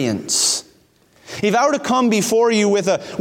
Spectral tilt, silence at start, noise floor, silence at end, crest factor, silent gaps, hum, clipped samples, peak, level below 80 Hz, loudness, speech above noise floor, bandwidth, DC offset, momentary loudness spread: -3 dB/octave; 0 s; -54 dBFS; 0 s; 14 dB; none; none; under 0.1%; -4 dBFS; -62 dBFS; -17 LUFS; 38 dB; 17 kHz; under 0.1%; 7 LU